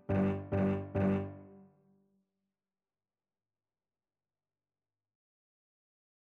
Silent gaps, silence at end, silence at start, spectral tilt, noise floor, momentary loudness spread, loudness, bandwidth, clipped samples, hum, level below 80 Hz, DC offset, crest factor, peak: none; 4.65 s; 0.1 s; -10.5 dB/octave; under -90 dBFS; 10 LU; -33 LUFS; 4 kHz; under 0.1%; none; -64 dBFS; under 0.1%; 18 dB; -20 dBFS